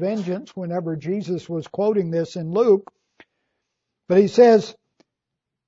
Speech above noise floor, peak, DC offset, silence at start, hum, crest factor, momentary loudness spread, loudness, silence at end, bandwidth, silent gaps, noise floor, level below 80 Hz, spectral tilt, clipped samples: 64 dB; -2 dBFS; under 0.1%; 0 s; none; 18 dB; 14 LU; -20 LUFS; 0.95 s; 7.8 kHz; none; -83 dBFS; -70 dBFS; -7 dB/octave; under 0.1%